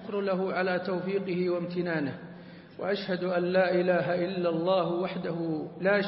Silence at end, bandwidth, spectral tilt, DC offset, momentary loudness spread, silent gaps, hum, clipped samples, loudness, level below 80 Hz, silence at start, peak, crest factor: 0 s; 5.8 kHz; -10.5 dB/octave; under 0.1%; 9 LU; none; none; under 0.1%; -29 LUFS; -72 dBFS; 0 s; -14 dBFS; 16 dB